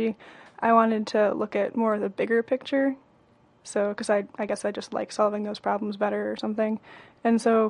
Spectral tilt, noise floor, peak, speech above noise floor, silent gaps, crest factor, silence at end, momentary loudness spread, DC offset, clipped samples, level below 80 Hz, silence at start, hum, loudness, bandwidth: -5.5 dB/octave; -60 dBFS; -6 dBFS; 35 dB; none; 18 dB; 0 s; 9 LU; under 0.1%; under 0.1%; -72 dBFS; 0 s; none; -26 LUFS; 11 kHz